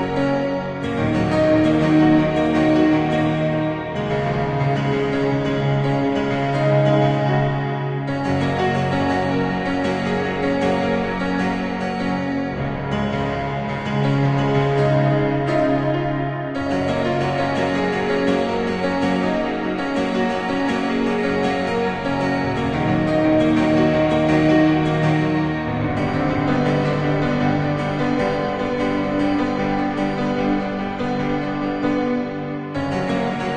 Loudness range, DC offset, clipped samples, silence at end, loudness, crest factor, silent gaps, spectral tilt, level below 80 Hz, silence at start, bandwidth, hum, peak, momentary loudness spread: 4 LU; under 0.1%; under 0.1%; 0 s; -20 LUFS; 16 dB; none; -7.5 dB/octave; -42 dBFS; 0 s; 9 kHz; none; -4 dBFS; 7 LU